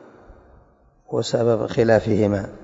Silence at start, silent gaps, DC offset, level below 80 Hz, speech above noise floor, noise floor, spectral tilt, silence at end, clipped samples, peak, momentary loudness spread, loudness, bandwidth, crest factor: 0.3 s; none; under 0.1%; -48 dBFS; 36 dB; -55 dBFS; -6.5 dB/octave; 0 s; under 0.1%; -4 dBFS; 8 LU; -20 LUFS; 8 kHz; 18 dB